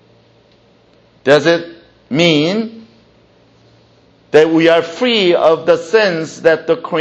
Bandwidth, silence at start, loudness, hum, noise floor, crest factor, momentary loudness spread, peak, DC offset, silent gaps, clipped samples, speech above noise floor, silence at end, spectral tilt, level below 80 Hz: 8.4 kHz; 1.25 s; -13 LUFS; none; -50 dBFS; 14 dB; 9 LU; 0 dBFS; under 0.1%; none; under 0.1%; 38 dB; 0 s; -5 dB/octave; -58 dBFS